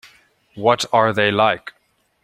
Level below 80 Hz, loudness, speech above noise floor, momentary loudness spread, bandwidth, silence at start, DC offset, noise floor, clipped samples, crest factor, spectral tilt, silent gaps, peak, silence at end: -62 dBFS; -17 LUFS; 47 dB; 9 LU; 15.5 kHz; 0.55 s; under 0.1%; -64 dBFS; under 0.1%; 18 dB; -4.5 dB/octave; none; -2 dBFS; 0.55 s